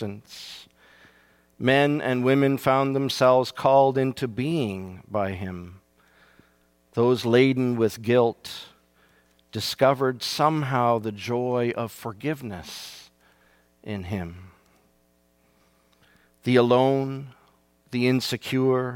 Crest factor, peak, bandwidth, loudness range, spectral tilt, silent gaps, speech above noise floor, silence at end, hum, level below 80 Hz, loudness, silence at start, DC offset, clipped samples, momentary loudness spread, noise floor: 20 dB; -6 dBFS; 18 kHz; 14 LU; -6 dB/octave; none; 41 dB; 0 s; none; -62 dBFS; -23 LUFS; 0 s; under 0.1%; under 0.1%; 18 LU; -64 dBFS